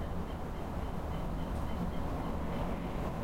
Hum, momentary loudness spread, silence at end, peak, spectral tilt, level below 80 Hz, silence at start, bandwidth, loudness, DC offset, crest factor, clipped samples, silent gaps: none; 3 LU; 0 s; -22 dBFS; -7.5 dB/octave; -40 dBFS; 0 s; 16.5 kHz; -39 LUFS; under 0.1%; 14 dB; under 0.1%; none